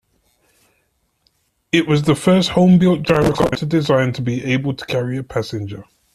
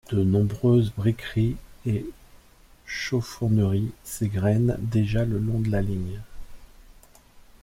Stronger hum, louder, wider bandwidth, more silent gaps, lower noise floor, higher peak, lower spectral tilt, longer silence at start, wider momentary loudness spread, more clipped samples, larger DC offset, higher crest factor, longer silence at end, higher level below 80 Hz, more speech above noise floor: neither; first, -17 LUFS vs -25 LUFS; second, 13.5 kHz vs 16 kHz; neither; first, -65 dBFS vs -53 dBFS; first, -2 dBFS vs -10 dBFS; about the same, -6.5 dB/octave vs -7.5 dB/octave; first, 1.75 s vs 0.1 s; about the same, 11 LU vs 11 LU; neither; neither; about the same, 16 dB vs 16 dB; about the same, 0.3 s vs 0.2 s; about the same, -46 dBFS vs -42 dBFS; first, 49 dB vs 30 dB